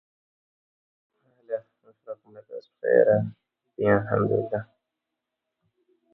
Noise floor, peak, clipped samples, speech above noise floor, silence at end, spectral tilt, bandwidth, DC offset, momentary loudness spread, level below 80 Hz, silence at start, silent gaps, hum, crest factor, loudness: -84 dBFS; -6 dBFS; under 0.1%; 60 dB; 1.5 s; -11.5 dB/octave; 4.5 kHz; under 0.1%; 22 LU; -60 dBFS; 1.5 s; none; none; 22 dB; -25 LUFS